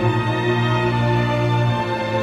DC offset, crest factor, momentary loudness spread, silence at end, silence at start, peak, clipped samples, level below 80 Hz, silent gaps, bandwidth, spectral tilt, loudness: under 0.1%; 12 dB; 2 LU; 0 s; 0 s; -6 dBFS; under 0.1%; -42 dBFS; none; 8.4 kHz; -7 dB/octave; -19 LUFS